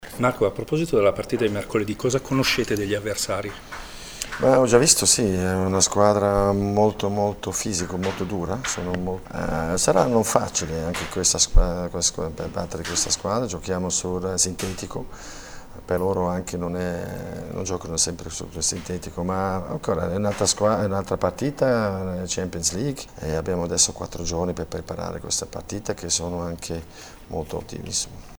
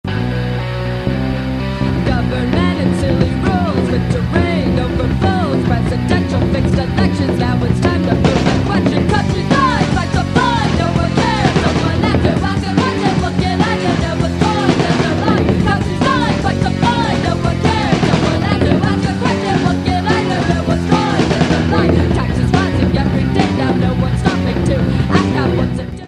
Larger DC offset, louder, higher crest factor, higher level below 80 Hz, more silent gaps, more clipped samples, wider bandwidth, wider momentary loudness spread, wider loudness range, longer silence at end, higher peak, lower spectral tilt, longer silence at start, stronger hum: neither; second, -23 LUFS vs -15 LUFS; first, 24 dB vs 14 dB; second, -36 dBFS vs -28 dBFS; neither; neither; first, over 20 kHz vs 11.5 kHz; first, 14 LU vs 3 LU; first, 8 LU vs 1 LU; about the same, 0 s vs 0 s; about the same, 0 dBFS vs 0 dBFS; second, -3.5 dB/octave vs -6.5 dB/octave; about the same, 0 s vs 0.05 s; neither